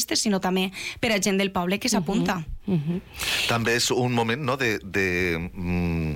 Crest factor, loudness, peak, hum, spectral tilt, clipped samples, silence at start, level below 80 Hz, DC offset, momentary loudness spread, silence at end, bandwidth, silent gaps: 14 dB; -24 LUFS; -10 dBFS; none; -4 dB/octave; under 0.1%; 0 s; -44 dBFS; under 0.1%; 6 LU; 0 s; 17 kHz; none